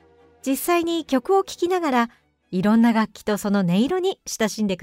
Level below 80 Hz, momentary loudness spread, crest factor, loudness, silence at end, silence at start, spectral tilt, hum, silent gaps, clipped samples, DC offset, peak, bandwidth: -58 dBFS; 8 LU; 14 dB; -22 LUFS; 0.05 s; 0.45 s; -5.5 dB/octave; none; none; under 0.1%; under 0.1%; -8 dBFS; 16 kHz